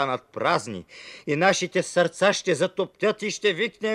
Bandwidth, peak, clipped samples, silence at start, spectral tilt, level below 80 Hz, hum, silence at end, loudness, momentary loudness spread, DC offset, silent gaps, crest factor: 12.5 kHz; -6 dBFS; under 0.1%; 0 s; -3.5 dB/octave; -68 dBFS; none; 0 s; -24 LUFS; 12 LU; under 0.1%; none; 18 dB